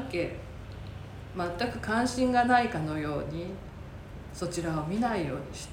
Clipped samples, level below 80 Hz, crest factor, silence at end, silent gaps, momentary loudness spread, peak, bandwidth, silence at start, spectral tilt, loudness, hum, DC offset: under 0.1%; -48 dBFS; 20 dB; 0 s; none; 18 LU; -12 dBFS; 16.5 kHz; 0 s; -5.5 dB/octave; -30 LUFS; none; under 0.1%